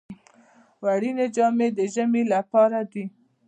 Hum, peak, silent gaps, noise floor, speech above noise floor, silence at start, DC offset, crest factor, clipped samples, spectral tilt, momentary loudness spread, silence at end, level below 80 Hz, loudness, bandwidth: none; -8 dBFS; none; -56 dBFS; 34 dB; 0.1 s; under 0.1%; 16 dB; under 0.1%; -6 dB/octave; 11 LU; 0.4 s; -74 dBFS; -23 LUFS; 9.2 kHz